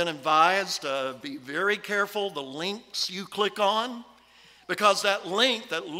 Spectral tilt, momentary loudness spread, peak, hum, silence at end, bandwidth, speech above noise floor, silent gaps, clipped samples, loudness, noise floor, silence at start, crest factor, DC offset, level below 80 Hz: -2.5 dB/octave; 12 LU; -8 dBFS; none; 0 s; 16 kHz; 29 dB; none; under 0.1%; -26 LUFS; -56 dBFS; 0 s; 20 dB; under 0.1%; -76 dBFS